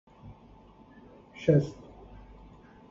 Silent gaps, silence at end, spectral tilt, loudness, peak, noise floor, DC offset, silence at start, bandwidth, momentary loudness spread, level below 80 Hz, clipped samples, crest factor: none; 1.15 s; -8.5 dB/octave; -27 LUFS; -10 dBFS; -54 dBFS; under 0.1%; 0.25 s; 7.4 kHz; 27 LU; -56 dBFS; under 0.1%; 24 dB